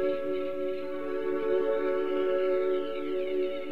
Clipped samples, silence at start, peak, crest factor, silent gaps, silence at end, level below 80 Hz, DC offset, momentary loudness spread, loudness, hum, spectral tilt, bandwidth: under 0.1%; 0 s; -16 dBFS; 12 dB; none; 0 s; -70 dBFS; 1%; 6 LU; -30 LUFS; none; -6.5 dB/octave; 5.2 kHz